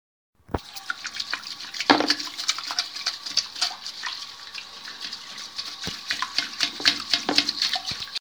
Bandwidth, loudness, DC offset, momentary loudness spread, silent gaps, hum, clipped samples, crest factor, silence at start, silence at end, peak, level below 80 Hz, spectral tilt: over 20 kHz; -26 LUFS; 0.1%; 14 LU; none; none; under 0.1%; 28 dB; 0.5 s; 0 s; 0 dBFS; -54 dBFS; -1 dB/octave